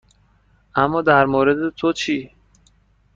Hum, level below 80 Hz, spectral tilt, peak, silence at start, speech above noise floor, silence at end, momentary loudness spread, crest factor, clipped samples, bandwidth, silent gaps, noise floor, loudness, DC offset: none; -50 dBFS; -5.5 dB/octave; -2 dBFS; 0.75 s; 40 dB; 0.9 s; 9 LU; 18 dB; under 0.1%; 7.6 kHz; none; -57 dBFS; -18 LUFS; under 0.1%